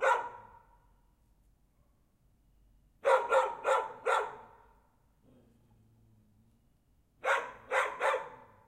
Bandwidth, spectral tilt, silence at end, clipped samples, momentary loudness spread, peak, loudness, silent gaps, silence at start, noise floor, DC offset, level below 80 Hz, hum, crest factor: 14.5 kHz; -1.5 dB/octave; 0.3 s; under 0.1%; 16 LU; -14 dBFS; -32 LUFS; none; 0 s; -69 dBFS; under 0.1%; -70 dBFS; none; 22 dB